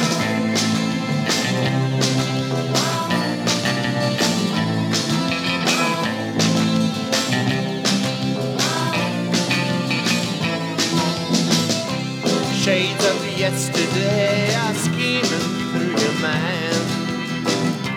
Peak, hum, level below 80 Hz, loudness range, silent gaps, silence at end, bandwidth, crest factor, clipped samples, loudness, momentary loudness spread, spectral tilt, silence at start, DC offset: -4 dBFS; none; -58 dBFS; 1 LU; none; 0 s; 18 kHz; 16 dB; under 0.1%; -20 LUFS; 4 LU; -4 dB/octave; 0 s; under 0.1%